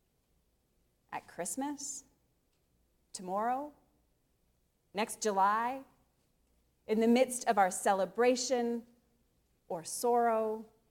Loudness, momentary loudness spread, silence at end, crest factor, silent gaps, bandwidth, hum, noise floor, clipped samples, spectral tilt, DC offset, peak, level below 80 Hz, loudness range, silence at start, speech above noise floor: -32 LUFS; 16 LU; 0.25 s; 20 dB; none; 17 kHz; none; -75 dBFS; under 0.1%; -3.5 dB/octave; under 0.1%; -14 dBFS; -76 dBFS; 10 LU; 1.1 s; 43 dB